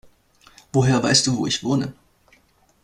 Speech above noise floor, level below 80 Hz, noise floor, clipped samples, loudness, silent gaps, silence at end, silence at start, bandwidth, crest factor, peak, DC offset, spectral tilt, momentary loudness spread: 39 dB; -52 dBFS; -59 dBFS; under 0.1%; -20 LUFS; none; 0.9 s; 0.75 s; 12 kHz; 20 dB; -2 dBFS; under 0.1%; -4 dB/octave; 8 LU